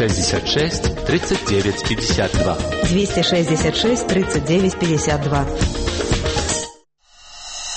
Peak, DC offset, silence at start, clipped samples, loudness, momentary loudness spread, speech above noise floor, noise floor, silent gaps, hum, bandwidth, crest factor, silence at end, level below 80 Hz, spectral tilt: -6 dBFS; under 0.1%; 0 s; under 0.1%; -19 LUFS; 5 LU; 32 dB; -50 dBFS; none; none; 8.8 kHz; 14 dB; 0 s; -30 dBFS; -4.5 dB/octave